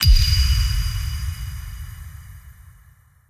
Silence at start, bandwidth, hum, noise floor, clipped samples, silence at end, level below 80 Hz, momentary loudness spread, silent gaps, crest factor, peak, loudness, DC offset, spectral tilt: 0 s; 16.5 kHz; none; -52 dBFS; under 0.1%; 0.75 s; -22 dBFS; 24 LU; none; 18 dB; -2 dBFS; -21 LUFS; under 0.1%; -3 dB/octave